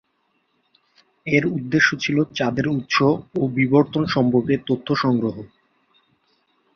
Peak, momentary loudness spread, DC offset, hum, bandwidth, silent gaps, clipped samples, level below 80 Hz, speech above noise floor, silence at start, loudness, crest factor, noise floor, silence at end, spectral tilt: -2 dBFS; 6 LU; under 0.1%; none; 6.8 kHz; none; under 0.1%; -56 dBFS; 49 dB; 1.25 s; -20 LUFS; 20 dB; -68 dBFS; 1.3 s; -6 dB/octave